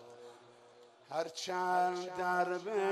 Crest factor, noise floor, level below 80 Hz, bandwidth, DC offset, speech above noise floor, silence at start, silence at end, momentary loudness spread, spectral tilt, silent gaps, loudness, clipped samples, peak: 18 dB; -60 dBFS; -84 dBFS; 13.5 kHz; under 0.1%; 26 dB; 0 s; 0 s; 21 LU; -4 dB/octave; none; -35 LUFS; under 0.1%; -20 dBFS